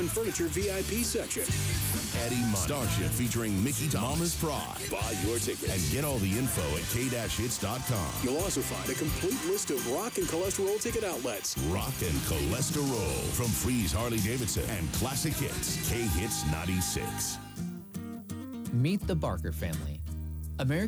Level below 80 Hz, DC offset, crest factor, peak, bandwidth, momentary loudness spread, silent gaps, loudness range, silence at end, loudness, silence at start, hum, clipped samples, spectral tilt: -42 dBFS; under 0.1%; 14 dB; -18 dBFS; over 20 kHz; 5 LU; none; 3 LU; 0 s; -31 LUFS; 0 s; none; under 0.1%; -4 dB/octave